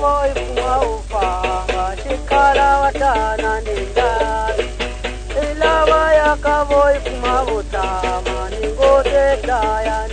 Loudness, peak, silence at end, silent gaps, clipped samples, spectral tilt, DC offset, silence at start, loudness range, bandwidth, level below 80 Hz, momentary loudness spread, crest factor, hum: -17 LUFS; -2 dBFS; 0 s; none; under 0.1%; -4.5 dB/octave; under 0.1%; 0 s; 1 LU; 9.6 kHz; -26 dBFS; 9 LU; 16 dB; none